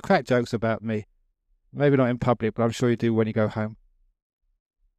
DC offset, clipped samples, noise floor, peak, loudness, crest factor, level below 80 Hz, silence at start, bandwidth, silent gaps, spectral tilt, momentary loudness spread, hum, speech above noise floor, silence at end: under 0.1%; under 0.1%; -68 dBFS; -8 dBFS; -24 LUFS; 18 dB; -56 dBFS; 0.05 s; 12.5 kHz; none; -7 dB/octave; 10 LU; none; 45 dB; 1.25 s